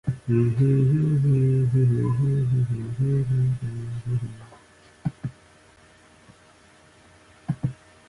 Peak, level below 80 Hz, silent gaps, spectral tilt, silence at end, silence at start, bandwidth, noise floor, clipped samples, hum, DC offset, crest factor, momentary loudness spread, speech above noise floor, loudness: -10 dBFS; -50 dBFS; none; -10 dB/octave; 0.35 s; 0.05 s; 10.5 kHz; -54 dBFS; under 0.1%; none; under 0.1%; 14 dB; 13 LU; 33 dB; -24 LUFS